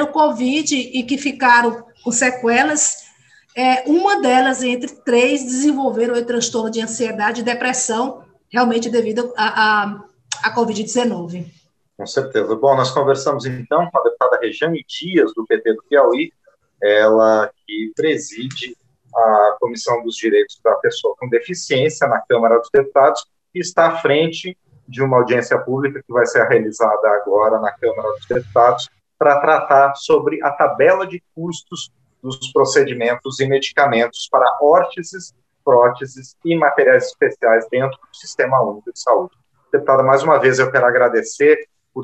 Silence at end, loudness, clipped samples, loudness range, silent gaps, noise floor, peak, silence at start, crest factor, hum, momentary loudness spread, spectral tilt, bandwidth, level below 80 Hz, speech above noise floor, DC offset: 0 s; -16 LUFS; under 0.1%; 3 LU; none; -51 dBFS; 0 dBFS; 0 s; 16 dB; none; 14 LU; -4 dB/octave; 9.4 kHz; -64 dBFS; 35 dB; under 0.1%